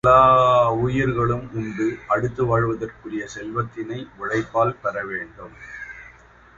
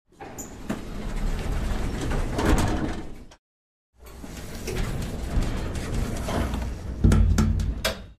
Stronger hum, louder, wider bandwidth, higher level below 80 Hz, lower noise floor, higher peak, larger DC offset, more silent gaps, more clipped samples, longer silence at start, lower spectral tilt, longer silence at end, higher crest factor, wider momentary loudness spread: neither; first, -21 LUFS vs -28 LUFS; second, 7.6 kHz vs 15 kHz; second, -46 dBFS vs -30 dBFS; second, -49 dBFS vs under -90 dBFS; first, -2 dBFS vs -6 dBFS; neither; second, none vs 3.39-3.93 s; neither; second, 0.05 s vs 0.2 s; about the same, -7 dB/octave vs -6 dB/octave; first, 0.5 s vs 0.05 s; about the same, 18 dB vs 20 dB; first, 20 LU vs 16 LU